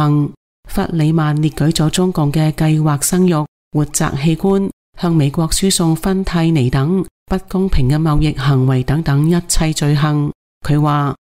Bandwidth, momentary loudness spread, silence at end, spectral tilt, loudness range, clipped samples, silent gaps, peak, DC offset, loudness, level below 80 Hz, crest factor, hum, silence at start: 16 kHz; 6 LU; 0.2 s; -6 dB/octave; 1 LU; under 0.1%; 0.37-0.63 s, 3.48-3.71 s, 4.73-4.93 s, 7.11-7.26 s, 10.35-10.61 s; -2 dBFS; under 0.1%; -15 LUFS; -28 dBFS; 14 dB; none; 0 s